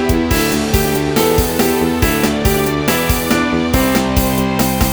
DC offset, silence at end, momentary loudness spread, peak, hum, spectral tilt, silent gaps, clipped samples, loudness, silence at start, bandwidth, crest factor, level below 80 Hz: under 0.1%; 0 s; 1 LU; 0 dBFS; none; -4.5 dB/octave; none; under 0.1%; -14 LUFS; 0 s; over 20 kHz; 14 dB; -24 dBFS